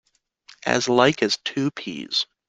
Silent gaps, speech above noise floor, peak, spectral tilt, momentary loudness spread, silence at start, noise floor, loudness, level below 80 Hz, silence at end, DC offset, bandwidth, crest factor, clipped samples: none; 32 dB; -2 dBFS; -3.5 dB/octave; 10 LU; 0.65 s; -54 dBFS; -22 LUFS; -62 dBFS; 0.25 s; under 0.1%; 9.6 kHz; 22 dB; under 0.1%